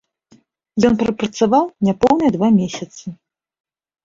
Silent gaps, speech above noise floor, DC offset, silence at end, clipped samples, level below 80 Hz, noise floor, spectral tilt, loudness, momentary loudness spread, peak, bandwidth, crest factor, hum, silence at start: none; 38 dB; under 0.1%; 0.9 s; under 0.1%; -50 dBFS; -54 dBFS; -6.5 dB/octave; -17 LUFS; 15 LU; -2 dBFS; 7.6 kHz; 16 dB; none; 0.75 s